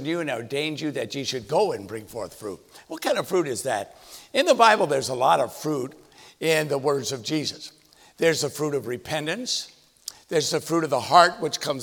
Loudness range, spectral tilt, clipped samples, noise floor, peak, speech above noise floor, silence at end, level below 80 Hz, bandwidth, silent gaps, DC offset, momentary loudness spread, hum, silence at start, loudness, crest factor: 5 LU; -3.5 dB/octave; under 0.1%; -43 dBFS; -2 dBFS; 19 dB; 0 s; -66 dBFS; over 20 kHz; none; under 0.1%; 20 LU; none; 0 s; -24 LUFS; 24 dB